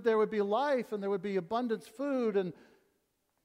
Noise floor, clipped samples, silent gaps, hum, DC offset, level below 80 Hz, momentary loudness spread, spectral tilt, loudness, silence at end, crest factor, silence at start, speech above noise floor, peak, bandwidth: -78 dBFS; under 0.1%; none; none; under 0.1%; -78 dBFS; 6 LU; -7 dB/octave; -33 LUFS; 0.9 s; 16 dB; 0 s; 47 dB; -16 dBFS; 13 kHz